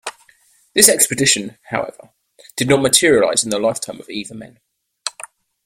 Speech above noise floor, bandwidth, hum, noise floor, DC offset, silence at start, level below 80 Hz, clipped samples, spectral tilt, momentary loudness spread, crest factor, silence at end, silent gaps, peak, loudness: 38 dB; 16.5 kHz; none; -55 dBFS; under 0.1%; 0.05 s; -54 dBFS; under 0.1%; -2 dB/octave; 20 LU; 18 dB; 0.55 s; none; 0 dBFS; -15 LUFS